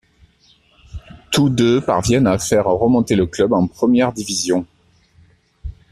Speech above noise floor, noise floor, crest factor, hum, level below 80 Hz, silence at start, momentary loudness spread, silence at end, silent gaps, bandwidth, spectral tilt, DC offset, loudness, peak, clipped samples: 39 dB; -55 dBFS; 16 dB; none; -42 dBFS; 0.95 s; 22 LU; 0.2 s; none; 14 kHz; -5.5 dB/octave; under 0.1%; -16 LUFS; -2 dBFS; under 0.1%